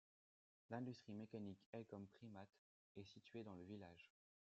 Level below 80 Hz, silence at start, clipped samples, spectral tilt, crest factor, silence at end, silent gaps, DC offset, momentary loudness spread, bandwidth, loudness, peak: under -90 dBFS; 0.7 s; under 0.1%; -6.5 dB/octave; 22 dB; 0.5 s; 1.66-1.73 s, 2.58-2.95 s; under 0.1%; 11 LU; 7.6 kHz; -57 LUFS; -36 dBFS